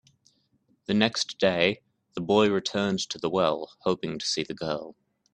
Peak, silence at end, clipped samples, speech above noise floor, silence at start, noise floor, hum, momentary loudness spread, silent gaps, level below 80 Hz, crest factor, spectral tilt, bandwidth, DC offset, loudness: -6 dBFS; 0.45 s; under 0.1%; 42 dB; 0.9 s; -69 dBFS; none; 13 LU; none; -66 dBFS; 22 dB; -4.5 dB/octave; 10.5 kHz; under 0.1%; -26 LUFS